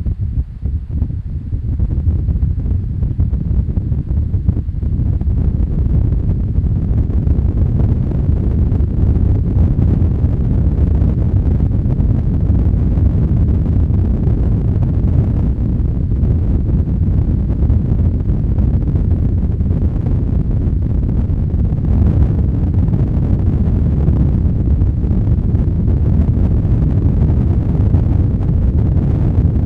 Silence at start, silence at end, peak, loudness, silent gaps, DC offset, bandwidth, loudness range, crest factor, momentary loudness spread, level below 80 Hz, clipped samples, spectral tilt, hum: 0 s; 0 s; 0 dBFS; -16 LUFS; none; under 0.1%; 2.9 kHz; 3 LU; 14 dB; 4 LU; -16 dBFS; under 0.1%; -12 dB/octave; none